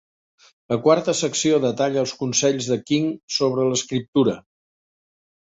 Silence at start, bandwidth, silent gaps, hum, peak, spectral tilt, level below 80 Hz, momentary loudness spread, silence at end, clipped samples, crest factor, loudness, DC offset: 0.7 s; 8.4 kHz; 3.23-3.28 s, 4.08-4.13 s; none; -4 dBFS; -4 dB/octave; -62 dBFS; 5 LU; 1 s; under 0.1%; 18 dB; -21 LUFS; under 0.1%